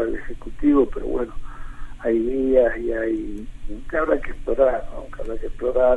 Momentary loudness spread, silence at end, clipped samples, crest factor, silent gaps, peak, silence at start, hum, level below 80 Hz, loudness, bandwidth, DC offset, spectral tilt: 19 LU; 0 s; under 0.1%; 18 dB; none; -4 dBFS; 0 s; none; -32 dBFS; -22 LUFS; 3.9 kHz; under 0.1%; -8 dB/octave